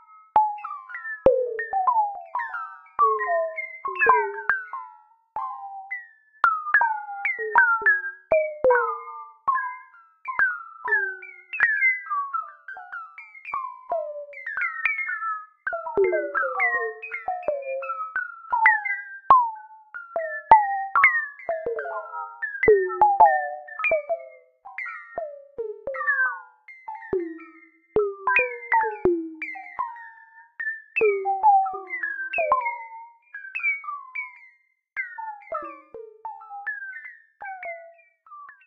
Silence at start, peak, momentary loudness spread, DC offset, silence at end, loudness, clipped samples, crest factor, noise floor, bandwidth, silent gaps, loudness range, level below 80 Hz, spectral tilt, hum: 0.35 s; 0 dBFS; 19 LU; under 0.1%; 0.15 s; -24 LUFS; under 0.1%; 26 dB; -60 dBFS; 5 kHz; none; 8 LU; -60 dBFS; -7 dB/octave; none